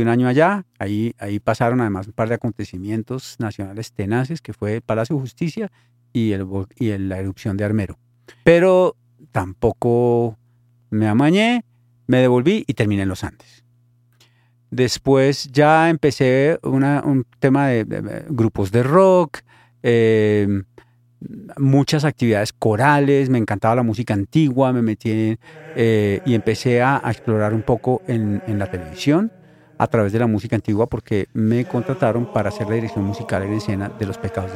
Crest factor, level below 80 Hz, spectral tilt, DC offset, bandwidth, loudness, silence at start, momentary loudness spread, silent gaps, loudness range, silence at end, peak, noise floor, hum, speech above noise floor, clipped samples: 18 dB; -50 dBFS; -7 dB/octave; under 0.1%; 14.5 kHz; -19 LUFS; 0 s; 11 LU; none; 6 LU; 0 s; 0 dBFS; -57 dBFS; none; 39 dB; under 0.1%